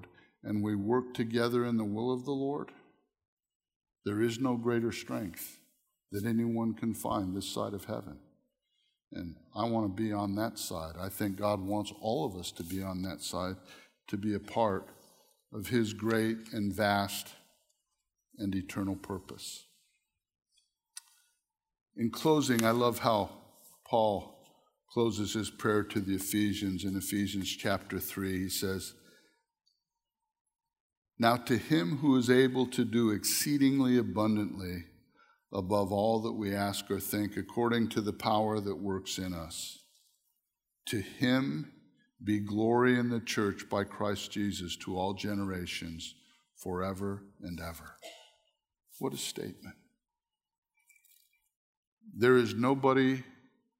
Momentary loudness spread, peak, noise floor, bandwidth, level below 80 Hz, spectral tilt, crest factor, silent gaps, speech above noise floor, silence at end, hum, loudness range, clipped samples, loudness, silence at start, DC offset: 15 LU; -10 dBFS; under -90 dBFS; 16 kHz; -64 dBFS; -5 dB/octave; 24 dB; 3.28-3.37 s, 3.55-3.60 s, 3.76-3.81 s, 21.81-21.86 s, 30.41-30.45 s, 30.80-31.02 s, 50.58-50.62 s, 51.56-51.97 s; over 58 dB; 0.5 s; none; 11 LU; under 0.1%; -32 LUFS; 0 s; under 0.1%